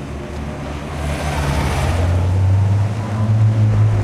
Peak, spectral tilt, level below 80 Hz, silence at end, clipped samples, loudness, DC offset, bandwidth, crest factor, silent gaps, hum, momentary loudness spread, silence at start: -6 dBFS; -7 dB/octave; -28 dBFS; 0 s; under 0.1%; -18 LUFS; under 0.1%; 12.5 kHz; 10 dB; none; none; 12 LU; 0 s